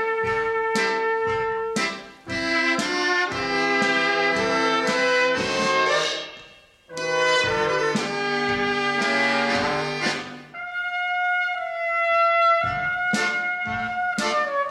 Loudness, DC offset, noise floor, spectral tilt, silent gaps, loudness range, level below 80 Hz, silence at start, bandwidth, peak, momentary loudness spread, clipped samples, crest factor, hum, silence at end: -22 LUFS; under 0.1%; -49 dBFS; -3 dB/octave; none; 2 LU; -56 dBFS; 0 s; 13 kHz; -8 dBFS; 7 LU; under 0.1%; 14 dB; none; 0 s